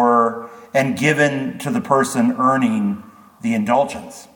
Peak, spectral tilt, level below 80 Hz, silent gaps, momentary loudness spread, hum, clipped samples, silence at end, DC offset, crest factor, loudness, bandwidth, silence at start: -2 dBFS; -5.5 dB/octave; -62 dBFS; none; 9 LU; none; under 0.1%; 0.1 s; under 0.1%; 16 dB; -18 LUFS; 19 kHz; 0 s